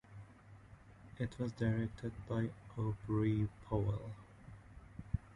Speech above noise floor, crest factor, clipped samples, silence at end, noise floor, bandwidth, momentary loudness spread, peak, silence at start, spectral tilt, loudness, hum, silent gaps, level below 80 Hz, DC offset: 21 dB; 18 dB; under 0.1%; 0 s; -59 dBFS; 10.5 kHz; 22 LU; -22 dBFS; 0.1 s; -9 dB/octave; -40 LUFS; none; none; -54 dBFS; under 0.1%